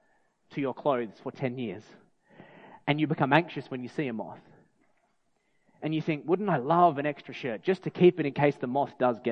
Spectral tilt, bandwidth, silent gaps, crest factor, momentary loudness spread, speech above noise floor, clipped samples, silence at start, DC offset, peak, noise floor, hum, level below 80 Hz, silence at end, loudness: -8.5 dB/octave; 6.6 kHz; none; 24 dB; 14 LU; 44 dB; under 0.1%; 0.5 s; under 0.1%; -4 dBFS; -72 dBFS; none; -74 dBFS; 0 s; -28 LUFS